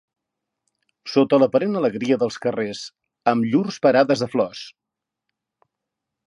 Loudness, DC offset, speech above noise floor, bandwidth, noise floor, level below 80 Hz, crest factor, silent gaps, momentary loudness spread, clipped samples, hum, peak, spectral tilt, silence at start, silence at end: -20 LUFS; under 0.1%; 63 dB; 11 kHz; -83 dBFS; -68 dBFS; 20 dB; none; 18 LU; under 0.1%; none; -2 dBFS; -6 dB/octave; 1.05 s; 1.6 s